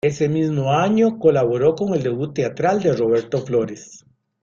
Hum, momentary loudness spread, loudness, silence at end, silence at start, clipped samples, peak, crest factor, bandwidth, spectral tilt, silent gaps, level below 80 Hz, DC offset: none; 7 LU; -19 LUFS; 0.45 s; 0.05 s; under 0.1%; -2 dBFS; 16 dB; 7.4 kHz; -7 dB/octave; none; -56 dBFS; under 0.1%